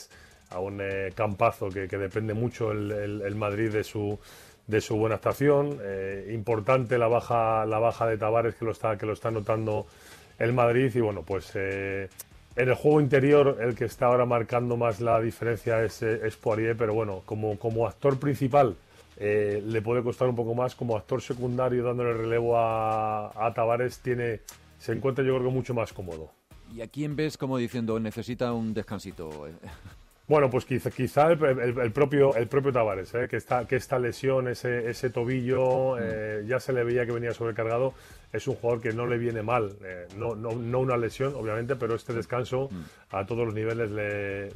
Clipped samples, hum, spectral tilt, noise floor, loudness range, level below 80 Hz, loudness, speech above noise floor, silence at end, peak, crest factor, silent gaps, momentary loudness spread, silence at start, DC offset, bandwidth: under 0.1%; none; -7 dB/octave; -52 dBFS; 6 LU; -56 dBFS; -27 LUFS; 25 dB; 0 s; -10 dBFS; 16 dB; none; 11 LU; 0 s; under 0.1%; 14.5 kHz